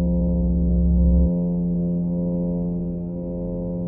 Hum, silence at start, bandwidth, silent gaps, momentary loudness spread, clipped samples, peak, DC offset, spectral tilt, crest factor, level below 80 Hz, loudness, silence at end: none; 0 s; 1.1 kHz; none; 9 LU; under 0.1%; -8 dBFS; under 0.1%; -17 dB/octave; 12 dB; -24 dBFS; -22 LUFS; 0 s